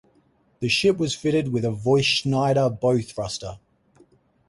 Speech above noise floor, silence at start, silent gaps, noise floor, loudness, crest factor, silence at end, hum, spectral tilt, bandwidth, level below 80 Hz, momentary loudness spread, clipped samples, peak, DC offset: 40 dB; 0.6 s; none; -62 dBFS; -22 LUFS; 16 dB; 0.9 s; none; -5 dB/octave; 11.5 kHz; -54 dBFS; 11 LU; under 0.1%; -8 dBFS; under 0.1%